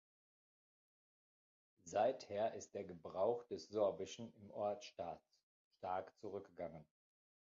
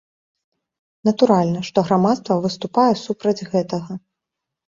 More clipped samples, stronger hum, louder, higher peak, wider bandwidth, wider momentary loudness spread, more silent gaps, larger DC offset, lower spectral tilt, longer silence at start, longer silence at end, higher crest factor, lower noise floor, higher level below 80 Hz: neither; neither; second, -44 LUFS vs -19 LUFS; second, -26 dBFS vs -2 dBFS; about the same, 7.4 kHz vs 7.6 kHz; first, 13 LU vs 10 LU; first, 5.43-5.71 s vs none; neither; second, -4.5 dB/octave vs -7 dB/octave; first, 1.85 s vs 1.05 s; about the same, 0.7 s vs 0.7 s; about the same, 20 dB vs 18 dB; first, under -90 dBFS vs -83 dBFS; second, -80 dBFS vs -60 dBFS